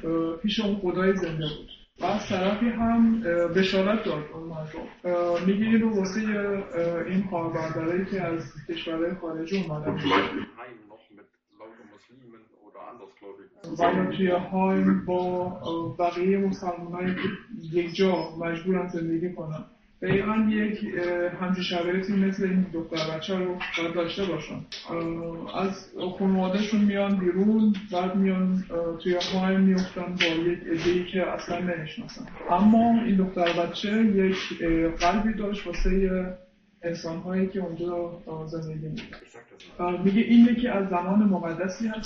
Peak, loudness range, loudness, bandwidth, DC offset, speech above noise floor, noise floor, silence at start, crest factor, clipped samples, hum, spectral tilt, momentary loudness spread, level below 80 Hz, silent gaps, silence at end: -6 dBFS; 6 LU; -26 LUFS; 6.6 kHz; under 0.1%; 31 dB; -57 dBFS; 0 s; 20 dB; under 0.1%; none; -7 dB/octave; 13 LU; -46 dBFS; none; 0 s